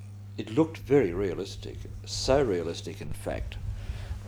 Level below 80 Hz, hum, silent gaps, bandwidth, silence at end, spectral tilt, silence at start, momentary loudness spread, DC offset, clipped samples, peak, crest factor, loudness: -42 dBFS; none; none; over 20 kHz; 0 s; -5.5 dB/octave; 0 s; 15 LU; under 0.1%; under 0.1%; -10 dBFS; 20 dB; -30 LUFS